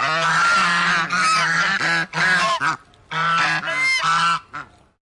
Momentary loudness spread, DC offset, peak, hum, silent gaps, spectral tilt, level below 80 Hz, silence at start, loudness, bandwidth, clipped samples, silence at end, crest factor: 8 LU; under 0.1%; -6 dBFS; none; none; -2 dB/octave; -58 dBFS; 0 s; -18 LUFS; 11.5 kHz; under 0.1%; 0.45 s; 14 dB